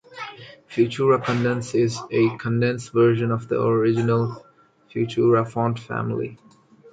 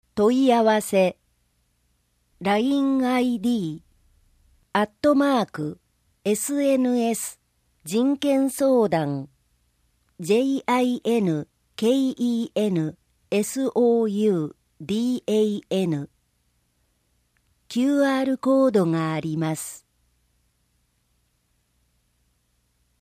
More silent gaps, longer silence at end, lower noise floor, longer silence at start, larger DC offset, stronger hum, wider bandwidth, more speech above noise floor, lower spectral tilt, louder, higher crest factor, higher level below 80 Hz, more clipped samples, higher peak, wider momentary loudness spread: neither; second, 0.05 s vs 3.25 s; second, -42 dBFS vs -69 dBFS; about the same, 0.1 s vs 0.15 s; neither; second, none vs 60 Hz at -50 dBFS; second, 9.2 kHz vs 15.5 kHz; second, 21 dB vs 47 dB; first, -7 dB/octave vs -5.5 dB/octave; about the same, -22 LUFS vs -23 LUFS; about the same, 16 dB vs 18 dB; about the same, -60 dBFS vs -64 dBFS; neither; about the same, -6 dBFS vs -6 dBFS; about the same, 12 LU vs 12 LU